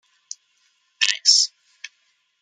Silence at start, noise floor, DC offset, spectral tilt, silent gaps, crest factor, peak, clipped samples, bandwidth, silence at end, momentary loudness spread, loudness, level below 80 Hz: 1 s; -67 dBFS; under 0.1%; 10 dB/octave; none; 24 dB; 0 dBFS; under 0.1%; 11.5 kHz; 0.95 s; 26 LU; -17 LUFS; under -90 dBFS